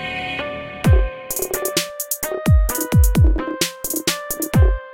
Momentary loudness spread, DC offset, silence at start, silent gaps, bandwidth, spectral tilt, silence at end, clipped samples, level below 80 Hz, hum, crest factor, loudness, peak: 8 LU; under 0.1%; 0 s; none; 17 kHz; -4.5 dB/octave; 0 s; under 0.1%; -22 dBFS; none; 16 dB; -19 LUFS; -2 dBFS